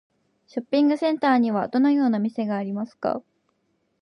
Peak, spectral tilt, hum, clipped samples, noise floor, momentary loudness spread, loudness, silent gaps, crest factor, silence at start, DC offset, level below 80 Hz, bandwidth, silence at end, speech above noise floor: -10 dBFS; -7.5 dB/octave; none; under 0.1%; -71 dBFS; 11 LU; -23 LUFS; none; 14 dB; 0.55 s; under 0.1%; -74 dBFS; 9.8 kHz; 0.8 s; 49 dB